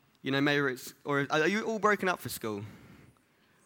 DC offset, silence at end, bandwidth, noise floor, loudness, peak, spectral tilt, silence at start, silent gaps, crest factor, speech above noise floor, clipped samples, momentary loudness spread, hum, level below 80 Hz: under 0.1%; 0.7 s; 19 kHz; -67 dBFS; -30 LUFS; -12 dBFS; -4.5 dB/octave; 0.25 s; none; 20 dB; 36 dB; under 0.1%; 12 LU; none; -70 dBFS